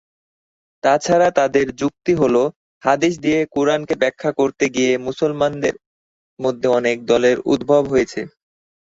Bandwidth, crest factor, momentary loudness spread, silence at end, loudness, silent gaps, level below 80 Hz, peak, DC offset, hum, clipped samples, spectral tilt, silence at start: 8 kHz; 16 dB; 8 LU; 0.7 s; -18 LUFS; 2.56-2.81 s, 5.86-6.37 s; -54 dBFS; -2 dBFS; under 0.1%; none; under 0.1%; -5 dB/octave; 0.85 s